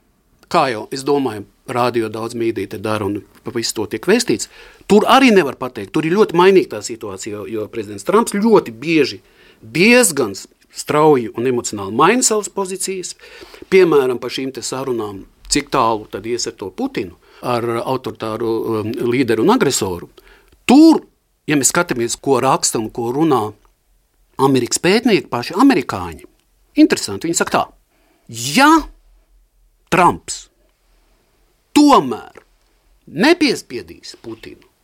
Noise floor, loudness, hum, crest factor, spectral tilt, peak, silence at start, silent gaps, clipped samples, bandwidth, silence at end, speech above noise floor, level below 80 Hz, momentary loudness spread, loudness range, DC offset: -59 dBFS; -16 LUFS; none; 16 dB; -4 dB/octave; 0 dBFS; 0.5 s; none; under 0.1%; 16.5 kHz; 0.3 s; 43 dB; -50 dBFS; 17 LU; 6 LU; under 0.1%